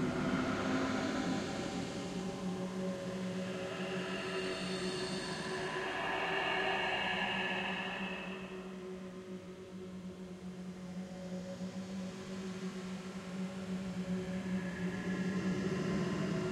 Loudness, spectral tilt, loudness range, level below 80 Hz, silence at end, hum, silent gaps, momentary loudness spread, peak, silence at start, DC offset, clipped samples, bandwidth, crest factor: -38 LUFS; -5 dB/octave; 10 LU; -64 dBFS; 0 s; none; none; 12 LU; -22 dBFS; 0 s; under 0.1%; under 0.1%; 12.5 kHz; 16 dB